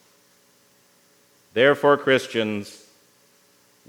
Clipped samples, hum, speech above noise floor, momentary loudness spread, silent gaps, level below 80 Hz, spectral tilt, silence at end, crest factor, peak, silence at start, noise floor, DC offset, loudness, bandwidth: under 0.1%; 60 Hz at -60 dBFS; 39 dB; 14 LU; none; -80 dBFS; -5 dB/octave; 1.15 s; 20 dB; -4 dBFS; 1.55 s; -59 dBFS; under 0.1%; -20 LUFS; 18 kHz